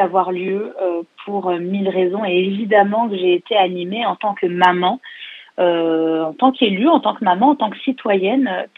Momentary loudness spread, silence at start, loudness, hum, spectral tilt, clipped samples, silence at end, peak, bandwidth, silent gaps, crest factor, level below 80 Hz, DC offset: 8 LU; 0 s; -17 LUFS; none; -7.5 dB/octave; under 0.1%; 0.1 s; 0 dBFS; 5.8 kHz; none; 18 dB; -78 dBFS; under 0.1%